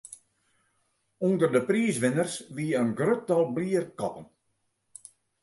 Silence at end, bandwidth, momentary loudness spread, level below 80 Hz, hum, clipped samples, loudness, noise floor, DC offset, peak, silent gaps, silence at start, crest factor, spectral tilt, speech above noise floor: 1.2 s; 12 kHz; 22 LU; -72 dBFS; none; under 0.1%; -27 LUFS; -76 dBFS; under 0.1%; -10 dBFS; none; 0.1 s; 18 dB; -6 dB/octave; 49 dB